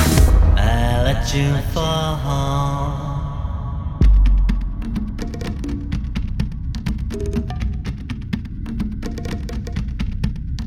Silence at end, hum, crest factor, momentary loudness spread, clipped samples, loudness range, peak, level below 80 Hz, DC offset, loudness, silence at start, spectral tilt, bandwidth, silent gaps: 0 s; none; 18 dB; 11 LU; under 0.1%; 7 LU; -2 dBFS; -20 dBFS; under 0.1%; -22 LUFS; 0 s; -6 dB/octave; 16.5 kHz; none